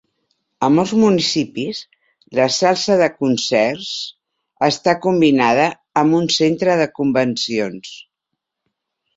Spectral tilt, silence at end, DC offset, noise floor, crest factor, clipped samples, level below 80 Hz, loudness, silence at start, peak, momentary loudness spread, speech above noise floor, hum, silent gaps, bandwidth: -4.5 dB/octave; 1.2 s; under 0.1%; -79 dBFS; 16 dB; under 0.1%; -58 dBFS; -17 LUFS; 0.6 s; 0 dBFS; 11 LU; 63 dB; none; none; 8 kHz